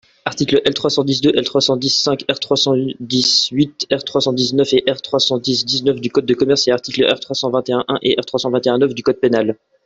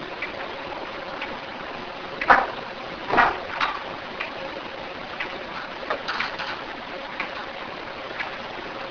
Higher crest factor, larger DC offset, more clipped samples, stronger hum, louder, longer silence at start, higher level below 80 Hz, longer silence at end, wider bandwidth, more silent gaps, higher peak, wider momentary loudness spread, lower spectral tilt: second, 14 dB vs 28 dB; neither; neither; neither; first, -16 LUFS vs -27 LUFS; first, 0.25 s vs 0 s; about the same, -56 dBFS vs -52 dBFS; first, 0.3 s vs 0 s; first, 8 kHz vs 5.4 kHz; neither; about the same, -2 dBFS vs 0 dBFS; second, 5 LU vs 13 LU; about the same, -4 dB/octave vs -4 dB/octave